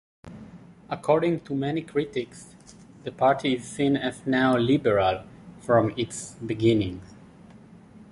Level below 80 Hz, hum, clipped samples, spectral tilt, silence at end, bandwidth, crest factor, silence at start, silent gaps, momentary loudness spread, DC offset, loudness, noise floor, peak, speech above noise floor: -54 dBFS; none; under 0.1%; -6 dB/octave; 0.15 s; 11.5 kHz; 18 dB; 0.25 s; none; 18 LU; under 0.1%; -25 LUFS; -49 dBFS; -8 dBFS; 25 dB